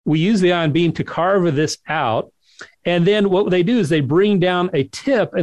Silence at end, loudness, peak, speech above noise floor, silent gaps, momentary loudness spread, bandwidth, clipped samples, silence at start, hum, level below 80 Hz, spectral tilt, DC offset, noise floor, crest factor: 0 s; -17 LUFS; -6 dBFS; 27 dB; none; 6 LU; 12 kHz; under 0.1%; 0.05 s; none; -54 dBFS; -6.5 dB/octave; 0.2%; -43 dBFS; 12 dB